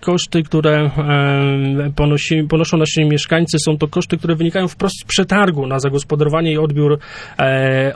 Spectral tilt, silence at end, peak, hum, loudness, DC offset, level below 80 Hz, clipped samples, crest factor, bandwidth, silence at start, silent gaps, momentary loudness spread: -5.5 dB/octave; 0 s; -2 dBFS; none; -15 LUFS; under 0.1%; -38 dBFS; under 0.1%; 14 dB; 11 kHz; 0 s; none; 4 LU